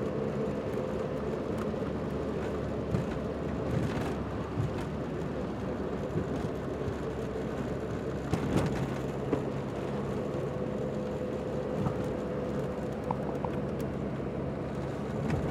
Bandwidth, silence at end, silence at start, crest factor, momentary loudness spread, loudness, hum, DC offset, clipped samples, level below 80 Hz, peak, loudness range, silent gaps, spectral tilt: 14.5 kHz; 0 s; 0 s; 18 dB; 3 LU; -34 LUFS; none; under 0.1%; under 0.1%; -48 dBFS; -14 dBFS; 1 LU; none; -7.5 dB/octave